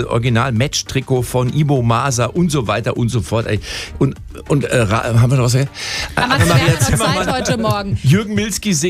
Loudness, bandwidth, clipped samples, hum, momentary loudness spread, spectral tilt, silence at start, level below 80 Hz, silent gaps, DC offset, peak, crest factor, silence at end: -16 LUFS; 15.5 kHz; under 0.1%; none; 6 LU; -5 dB/octave; 0 s; -34 dBFS; none; under 0.1%; -2 dBFS; 14 dB; 0 s